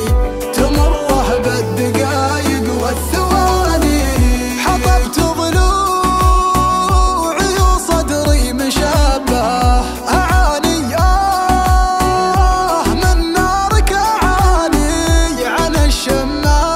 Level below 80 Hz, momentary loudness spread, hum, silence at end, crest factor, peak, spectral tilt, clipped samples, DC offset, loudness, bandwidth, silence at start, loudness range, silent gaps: -16 dBFS; 3 LU; none; 0 s; 12 dB; 0 dBFS; -5 dB/octave; under 0.1%; under 0.1%; -14 LUFS; 16 kHz; 0 s; 1 LU; none